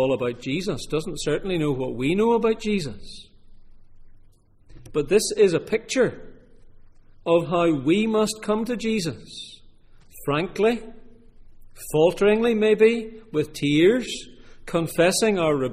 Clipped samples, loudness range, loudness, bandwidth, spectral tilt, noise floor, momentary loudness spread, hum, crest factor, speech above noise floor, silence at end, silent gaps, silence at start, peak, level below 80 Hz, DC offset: under 0.1%; 5 LU; -22 LUFS; 15.5 kHz; -5 dB/octave; -52 dBFS; 14 LU; none; 18 dB; 30 dB; 0 s; none; 0 s; -6 dBFS; -46 dBFS; under 0.1%